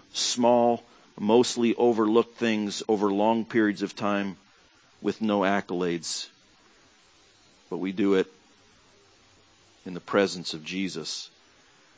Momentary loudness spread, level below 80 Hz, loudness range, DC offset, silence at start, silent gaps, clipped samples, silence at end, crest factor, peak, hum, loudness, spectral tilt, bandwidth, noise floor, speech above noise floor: 13 LU; -68 dBFS; 8 LU; under 0.1%; 0.15 s; none; under 0.1%; 0.7 s; 20 dB; -8 dBFS; none; -26 LUFS; -4.5 dB/octave; 8 kHz; -59 dBFS; 34 dB